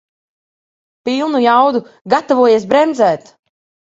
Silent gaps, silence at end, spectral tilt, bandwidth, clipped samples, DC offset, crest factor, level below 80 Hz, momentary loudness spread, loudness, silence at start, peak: 2.01-2.05 s; 0.7 s; -5 dB/octave; 8 kHz; under 0.1%; under 0.1%; 16 dB; -60 dBFS; 10 LU; -13 LUFS; 1.05 s; 0 dBFS